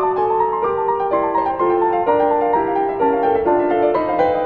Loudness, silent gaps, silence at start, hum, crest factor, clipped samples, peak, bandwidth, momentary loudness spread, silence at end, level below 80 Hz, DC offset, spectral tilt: -17 LUFS; none; 0 s; none; 14 dB; under 0.1%; -4 dBFS; 4.6 kHz; 3 LU; 0 s; -48 dBFS; under 0.1%; -8.5 dB/octave